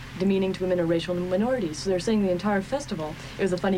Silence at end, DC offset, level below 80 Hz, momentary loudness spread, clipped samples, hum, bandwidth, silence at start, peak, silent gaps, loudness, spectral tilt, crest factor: 0 s; under 0.1%; -48 dBFS; 6 LU; under 0.1%; none; 15.5 kHz; 0 s; -12 dBFS; none; -26 LUFS; -6 dB/octave; 12 dB